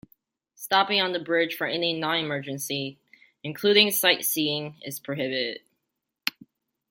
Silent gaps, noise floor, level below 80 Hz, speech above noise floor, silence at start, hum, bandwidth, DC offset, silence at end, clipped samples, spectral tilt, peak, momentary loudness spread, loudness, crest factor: none; -82 dBFS; -74 dBFS; 57 dB; 0.6 s; none; 17 kHz; under 0.1%; 0.6 s; under 0.1%; -2.5 dB/octave; -2 dBFS; 17 LU; -24 LUFS; 24 dB